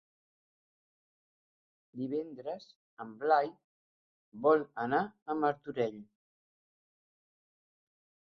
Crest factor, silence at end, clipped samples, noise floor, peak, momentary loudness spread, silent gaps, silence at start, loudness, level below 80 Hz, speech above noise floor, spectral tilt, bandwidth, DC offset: 22 dB; 2.35 s; under 0.1%; under -90 dBFS; -14 dBFS; 18 LU; 2.76-2.97 s, 3.64-4.32 s, 5.22-5.26 s; 1.95 s; -33 LUFS; -82 dBFS; over 57 dB; -4.5 dB/octave; 6.2 kHz; under 0.1%